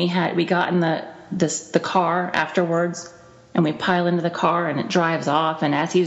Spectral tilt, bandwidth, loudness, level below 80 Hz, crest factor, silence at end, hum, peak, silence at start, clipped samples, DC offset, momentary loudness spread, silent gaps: -5 dB/octave; 8.2 kHz; -21 LUFS; -64 dBFS; 16 dB; 0 s; none; -4 dBFS; 0 s; under 0.1%; under 0.1%; 6 LU; none